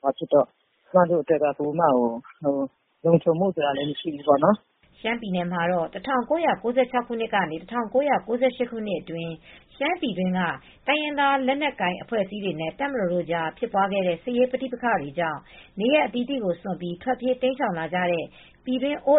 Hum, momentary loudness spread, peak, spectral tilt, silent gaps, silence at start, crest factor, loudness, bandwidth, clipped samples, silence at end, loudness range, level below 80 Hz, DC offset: none; 9 LU; -4 dBFS; -4 dB/octave; none; 0.05 s; 20 dB; -25 LUFS; 4 kHz; under 0.1%; 0 s; 3 LU; -60 dBFS; under 0.1%